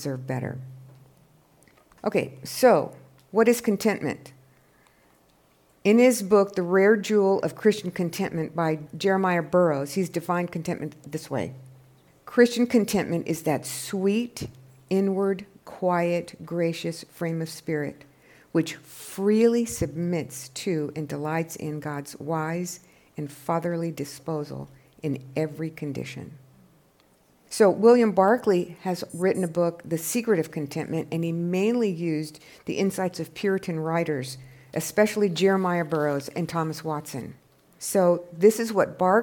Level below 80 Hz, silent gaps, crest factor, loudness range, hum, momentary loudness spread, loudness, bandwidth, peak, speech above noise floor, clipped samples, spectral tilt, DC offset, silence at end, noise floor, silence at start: -64 dBFS; none; 20 dB; 8 LU; none; 15 LU; -25 LUFS; 18 kHz; -6 dBFS; 37 dB; under 0.1%; -5.5 dB/octave; under 0.1%; 0 s; -61 dBFS; 0 s